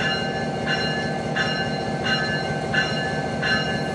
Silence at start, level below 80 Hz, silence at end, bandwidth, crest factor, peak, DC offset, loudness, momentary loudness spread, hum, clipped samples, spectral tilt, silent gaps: 0 s; -48 dBFS; 0 s; 11.5 kHz; 16 dB; -8 dBFS; under 0.1%; -23 LUFS; 3 LU; none; under 0.1%; -4.5 dB/octave; none